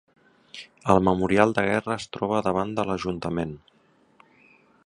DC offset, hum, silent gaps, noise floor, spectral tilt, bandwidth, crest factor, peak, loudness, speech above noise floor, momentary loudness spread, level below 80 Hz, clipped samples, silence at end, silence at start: under 0.1%; none; none; -62 dBFS; -6.5 dB/octave; 11 kHz; 24 dB; -2 dBFS; -24 LUFS; 38 dB; 20 LU; -50 dBFS; under 0.1%; 1.3 s; 0.55 s